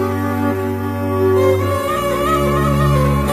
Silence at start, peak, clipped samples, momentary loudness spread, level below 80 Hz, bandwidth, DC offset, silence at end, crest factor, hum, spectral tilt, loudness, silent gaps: 0 s; -4 dBFS; under 0.1%; 6 LU; -28 dBFS; 15 kHz; under 0.1%; 0 s; 12 dB; none; -7 dB/octave; -16 LUFS; none